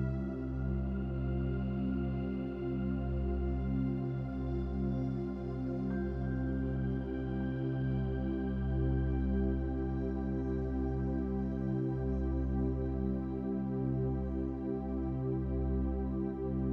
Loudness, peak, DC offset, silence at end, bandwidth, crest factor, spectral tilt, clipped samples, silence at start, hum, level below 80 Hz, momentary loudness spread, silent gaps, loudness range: -36 LUFS; -22 dBFS; under 0.1%; 0 s; 4.2 kHz; 12 dB; -11 dB/octave; under 0.1%; 0 s; none; -40 dBFS; 3 LU; none; 1 LU